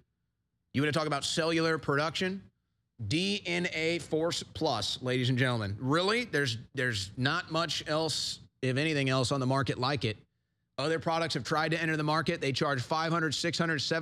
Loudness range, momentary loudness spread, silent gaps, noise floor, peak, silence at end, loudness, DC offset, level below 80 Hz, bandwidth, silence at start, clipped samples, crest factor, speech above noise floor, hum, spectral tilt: 2 LU; 5 LU; none; -81 dBFS; -14 dBFS; 0 s; -30 LUFS; under 0.1%; -64 dBFS; 14.5 kHz; 0.75 s; under 0.1%; 18 dB; 51 dB; none; -4.5 dB/octave